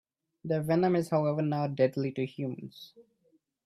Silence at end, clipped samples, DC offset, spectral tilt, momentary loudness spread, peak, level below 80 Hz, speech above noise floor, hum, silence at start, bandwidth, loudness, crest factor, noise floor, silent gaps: 0.65 s; under 0.1%; under 0.1%; -8 dB/octave; 17 LU; -14 dBFS; -70 dBFS; 41 dB; none; 0.45 s; 14 kHz; -30 LUFS; 18 dB; -71 dBFS; none